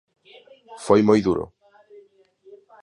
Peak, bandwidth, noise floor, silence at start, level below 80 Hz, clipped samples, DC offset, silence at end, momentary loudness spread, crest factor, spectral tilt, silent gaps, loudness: -4 dBFS; 11.5 kHz; -54 dBFS; 0.7 s; -54 dBFS; under 0.1%; under 0.1%; 0.25 s; 21 LU; 20 dB; -7 dB/octave; none; -19 LUFS